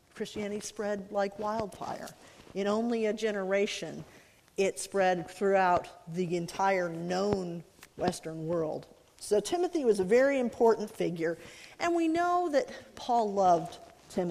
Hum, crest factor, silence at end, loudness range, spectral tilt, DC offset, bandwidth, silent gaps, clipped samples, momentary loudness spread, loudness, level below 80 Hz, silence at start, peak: none; 20 dB; 0 s; 4 LU; -5 dB/octave; under 0.1%; 15.5 kHz; none; under 0.1%; 15 LU; -30 LUFS; -64 dBFS; 0.15 s; -10 dBFS